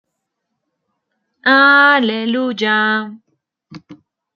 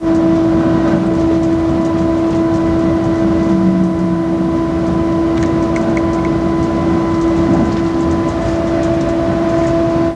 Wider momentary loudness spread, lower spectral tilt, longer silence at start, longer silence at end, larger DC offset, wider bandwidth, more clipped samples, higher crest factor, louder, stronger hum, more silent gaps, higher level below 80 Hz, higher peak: first, 11 LU vs 3 LU; second, -5 dB/octave vs -8 dB/octave; first, 1.45 s vs 0 s; first, 0.4 s vs 0 s; neither; second, 7 kHz vs 8.8 kHz; neither; about the same, 16 dB vs 12 dB; about the same, -13 LUFS vs -14 LUFS; neither; neither; second, -70 dBFS vs -30 dBFS; about the same, -2 dBFS vs -2 dBFS